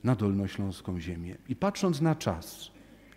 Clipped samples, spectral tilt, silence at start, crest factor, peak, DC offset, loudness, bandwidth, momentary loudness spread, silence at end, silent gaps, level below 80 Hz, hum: under 0.1%; -6.5 dB/octave; 0.05 s; 18 dB; -12 dBFS; under 0.1%; -31 LUFS; 16 kHz; 14 LU; 0.35 s; none; -54 dBFS; none